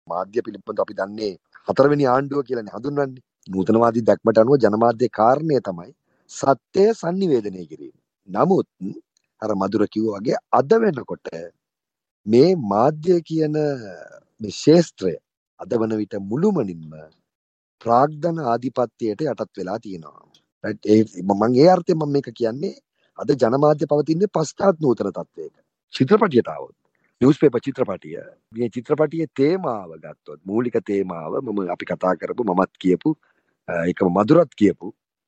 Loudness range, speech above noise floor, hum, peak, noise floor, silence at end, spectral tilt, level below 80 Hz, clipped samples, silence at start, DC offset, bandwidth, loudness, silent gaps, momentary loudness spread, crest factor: 5 LU; 66 dB; none; -2 dBFS; -86 dBFS; 0.35 s; -7 dB/octave; -64 dBFS; under 0.1%; 0.1 s; under 0.1%; 8.4 kHz; -20 LUFS; 12.11-12.24 s, 15.37-15.57 s, 17.35-17.78 s, 20.52-20.61 s, 25.84-25.88 s; 18 LU; 20 dB